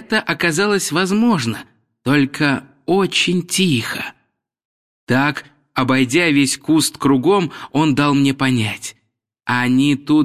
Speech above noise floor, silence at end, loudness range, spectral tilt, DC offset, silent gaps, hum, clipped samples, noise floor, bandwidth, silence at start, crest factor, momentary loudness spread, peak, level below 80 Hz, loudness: 53 dB; 0 s; 3 LU; -4.5 dB/octave; 0.2%; 4.65-5.07 s; none; under 0.1%; -69 dBFS; 15.5 kHz; 0 s; 16 dB; 10 LU; -2 dBFS; -56 dBFS; -17 LUFS